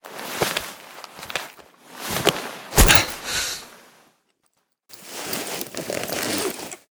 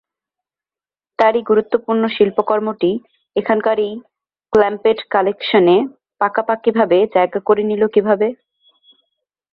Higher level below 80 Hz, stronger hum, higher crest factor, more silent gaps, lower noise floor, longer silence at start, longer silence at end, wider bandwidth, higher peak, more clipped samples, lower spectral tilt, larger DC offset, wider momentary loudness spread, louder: first, -32 dBFS vs -58 dBFS; neither; first, 26 dB vs 16 dB; neither; second, -70 dBFS vs under -90 dBFS; second, 0.05 s vs 1.2 s; second, 0.2 s vs 1.2 s; first, over 20 kHz vs 5.4 kHz; about the same, 0 dBFS vs -2 dBFS; neither; second, -2.5 dB/octave vs -7.5 dB/octave; neither; first, 23 LU vs 7 LU; second, -22 LUFS vs -16 LUFS